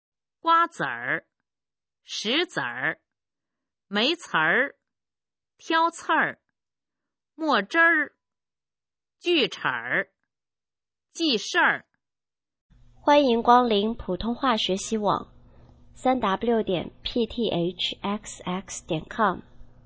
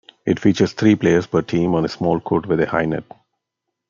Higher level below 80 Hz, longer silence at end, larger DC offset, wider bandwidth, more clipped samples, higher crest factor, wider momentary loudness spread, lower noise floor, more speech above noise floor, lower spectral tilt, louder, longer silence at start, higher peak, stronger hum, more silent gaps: about the same, -54 dBFS vs -52 dBFS; second, 0.2 s vs 0.9 s; neither; about the same, 8 kHz vs 7.4 kHz; neither; first, 22 dB vs 16 dB; first, 12 LU vs 5 LU; first, under -90 dBFS vs -80 dBFS; first, over 66 dB vs 62 dB; second, -4 dB/octave vs -7 dB/octave; second, -24 LUFS vs -19 LUFS; first, 0.45 s vs 0.25 s; about the same, -4 dBFS vs -2 dBFS; neither; first, 12.61-12.69 s vs none